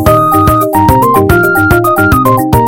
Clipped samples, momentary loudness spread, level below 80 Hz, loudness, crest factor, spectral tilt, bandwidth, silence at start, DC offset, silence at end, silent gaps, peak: 1%; 1 LU; -22 dBFS; -7 LUFS; 8 dB; -6.5 dB/octave; 17.5 kHz; 0 s; 1%; 0 s; none; 0 dBFS